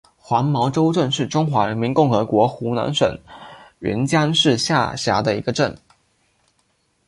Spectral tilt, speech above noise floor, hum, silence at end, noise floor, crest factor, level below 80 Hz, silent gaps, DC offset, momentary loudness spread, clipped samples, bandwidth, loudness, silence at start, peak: -5.5 dB/octave; 47 dB; none; 1.3 s; -65 dBFS; 18 dB; -52 dBFS; none; under 0.1%; 7 LU; under 0.1%; 11.5 kHz; -19 LUFS; 0.3 s; -2 dBFS